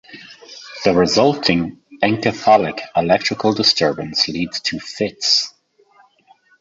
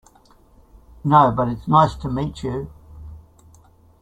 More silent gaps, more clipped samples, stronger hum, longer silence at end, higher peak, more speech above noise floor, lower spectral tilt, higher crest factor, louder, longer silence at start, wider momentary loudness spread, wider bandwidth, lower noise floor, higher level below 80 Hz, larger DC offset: neither; neither; neither; first, 1.1 s vs 0.85 s; about the same, -2 dBFS vs -2 dBFS; about the same, 37 dB vs 34 dB; second, -4 dB/octave vs -8 dB/octave; about the same, 18 dB vs 20 dB; about the same, -17 LUFS vs -19 LUFS; second, 0.1 s vs 1.05 s; second, 14 LU vs 22 LU; second, 8 kHz vs 9.2 kHz; about the same, -54 dBFS vs -53 dBFS; second, -50 dBFS vs -42 dBFS; neither